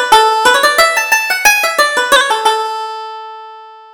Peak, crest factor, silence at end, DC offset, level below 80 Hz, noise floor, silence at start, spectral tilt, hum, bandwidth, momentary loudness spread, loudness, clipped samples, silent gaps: 0 dBFS; 12 dB; 0.15 s; under 0.1%; -46 dBFS; -34 dBFS; 0 s; 1 dB/octave; none; over 20 kHz; 17 LU; -10 LUFS; 0.2%; none